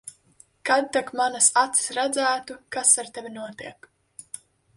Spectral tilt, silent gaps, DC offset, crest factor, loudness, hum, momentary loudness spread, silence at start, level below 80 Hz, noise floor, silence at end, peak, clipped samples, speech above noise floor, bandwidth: 0 dB/octave; none; under 0.1%; 22 dB; -22 LUFS; none; 22 LU; 0.05 s; -70 dBFS; -58 dBFS; 0.4 s; -2 dBFS; under 0.1%; 34 dB; 11.5 kHz